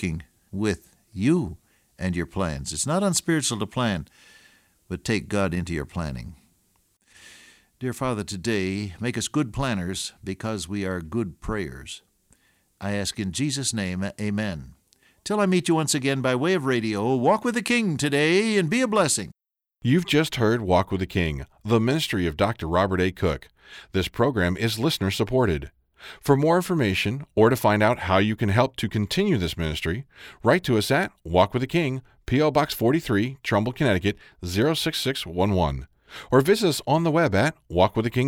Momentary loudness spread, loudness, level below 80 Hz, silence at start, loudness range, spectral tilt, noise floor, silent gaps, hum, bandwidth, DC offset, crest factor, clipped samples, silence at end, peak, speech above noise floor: 11 LU; -24 LUFS; -46 dBFS; 0 s; 8 LU; -5 dB/octave; -66 dBFS; none; none; 18 kHz; under 0.1%; 20 dB; under 0.1%; 0 s; -4 dBFS; 43 dB